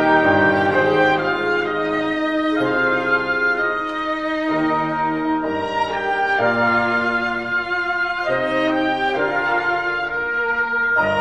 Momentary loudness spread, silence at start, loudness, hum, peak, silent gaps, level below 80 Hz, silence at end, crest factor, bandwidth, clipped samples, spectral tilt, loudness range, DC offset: 6 LU; 0 s; -19 LUFS; none; -4 dBFS; none; -52 dBFS; 0 s; 16 dB; 9.4 kHz; under 0.1%; -6 dB/octave; 2 LU; 0.3%